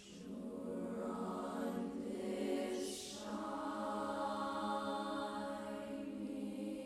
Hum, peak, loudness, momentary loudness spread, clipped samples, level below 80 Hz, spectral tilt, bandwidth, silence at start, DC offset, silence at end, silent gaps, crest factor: none; -28 dBFS; -43 LUFS; 5 LU; under 0.1%; -72 dBFS; -5 dB/octave; 15 kHz; 0 s; under 0.1%; 0 s; none; 14 dB